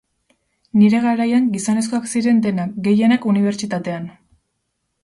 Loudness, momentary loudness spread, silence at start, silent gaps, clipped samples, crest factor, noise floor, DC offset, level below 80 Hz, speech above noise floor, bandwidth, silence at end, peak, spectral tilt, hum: -17 LUFS; 10 LU; 0.75 s; none; under 0.1%; 14 dB; -73 dBFS; under 0.1%; -62 dBFS; 56 dB; 11.5 kHz; 0.95 s; -4 dBFS; -6 dB/octave; none